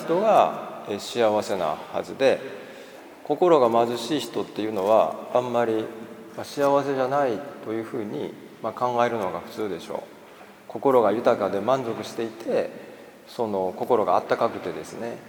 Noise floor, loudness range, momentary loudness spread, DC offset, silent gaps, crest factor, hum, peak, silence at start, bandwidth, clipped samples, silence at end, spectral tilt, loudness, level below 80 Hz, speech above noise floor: -47 dBFS; 4 LU; 16 LU; under 0.1%; none; 20 dB; none; -4 dBFS; 0 s; 20 kHz; under 0.1%; 0 s; -5.5 dB/octave; -24 LUFS; -72 dBFS; 23 dB